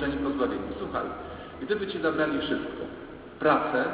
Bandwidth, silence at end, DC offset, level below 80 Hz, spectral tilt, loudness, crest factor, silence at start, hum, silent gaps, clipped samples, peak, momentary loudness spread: 4 kHz; 0 s; under 0.1%; -50 dBFS; -9.5 dB/octave; -29 LUFS; 20 dB; 0 s; none; none; under 0.1%; -10 dBFS; 14 LU